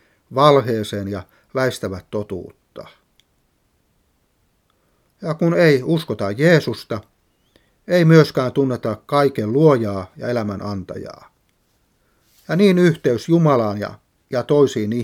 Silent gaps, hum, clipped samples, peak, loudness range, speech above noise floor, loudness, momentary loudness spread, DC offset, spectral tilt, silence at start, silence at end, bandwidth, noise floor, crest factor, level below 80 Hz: none; none; under 0.1%; 0 dBFS; 11 LU; 47 dB; -18 LUFS; 17 LU; under 0.1%; -7 dB/octave; 0.3 s; 0 s; 15 kHz; -64 dBFS; 20 dB; -60 dBFS